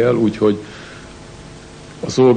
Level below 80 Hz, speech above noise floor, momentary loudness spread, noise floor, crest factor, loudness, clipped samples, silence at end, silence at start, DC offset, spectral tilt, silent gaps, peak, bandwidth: -46 dBFS; 22 dB; 22 LU; -37 dBFS; 16 dB; -18 LUFS; under 0.1%; 0 s; 0 s; under 0.1%; -6.5 dB/octave; none; -2 dBFS; 9.6 kHz